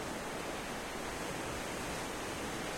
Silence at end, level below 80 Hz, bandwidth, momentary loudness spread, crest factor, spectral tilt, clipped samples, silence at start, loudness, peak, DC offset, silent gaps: 0 s; -54 dBFS; 16.5 kHz; 1 LU; 12 dB; -3.5 dB/octave; under 0.1%; 0 s; -40 LUFS; -28 dBFS; under 0.1%; none